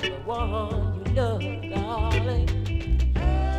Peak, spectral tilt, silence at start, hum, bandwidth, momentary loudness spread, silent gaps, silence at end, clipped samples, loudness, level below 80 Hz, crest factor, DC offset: -10 dBFS; -7 dB/octave; 0 s; none; 8.8 kHz; 5 LU; none; 0 s; under 0.1%; -26 LUFS; -28 dBFS; 14 dB; under 0.1%